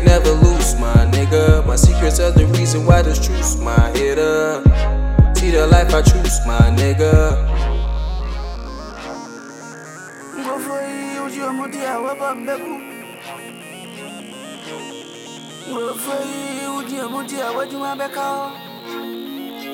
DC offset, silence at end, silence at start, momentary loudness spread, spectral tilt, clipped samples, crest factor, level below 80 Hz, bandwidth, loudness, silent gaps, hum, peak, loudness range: under 0.1%; 0 s; 0 s; 19 LU; -5.5 dB/octave; under 0.1%; 16 dB; -20 dBFS; 16.5 kHz; -17 LUFS; none; none; 0 dBFS; 14 LU